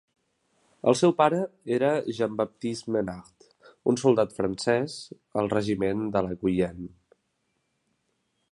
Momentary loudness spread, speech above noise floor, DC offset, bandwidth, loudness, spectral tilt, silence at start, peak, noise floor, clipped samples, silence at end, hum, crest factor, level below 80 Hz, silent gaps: 11 LU; 50 dB; under 0.1%; 11.5 kHz; -26 LUFS; -6 dB/octave; 0.85 s; -6 dBFS; -75 dBFS; under 0.1%; 1.65 s; none; 22 dB; -58 dBFS; none